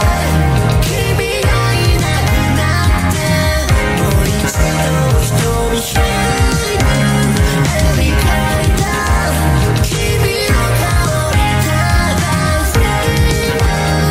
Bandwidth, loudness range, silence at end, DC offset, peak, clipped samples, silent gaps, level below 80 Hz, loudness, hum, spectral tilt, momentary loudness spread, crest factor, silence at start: 16.5 kHz; 0 LU; 0 s; under 0.1%; 0 dBFS; under 0.1%; none; -18 dBFS; -13 LUFS; none; -5 dB/octave; 1 LU; 12 dB; 0 s